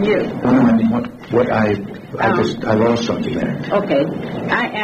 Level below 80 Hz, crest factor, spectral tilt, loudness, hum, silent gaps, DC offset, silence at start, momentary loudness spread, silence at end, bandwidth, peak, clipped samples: -46 dBFS; 14 dB; -7 dB/octave; -17 LUFS; none; none; under 0.1%; 0 s; 8 LU; 0 s; 8.2 kHz; -2 dBFS; under 0.1%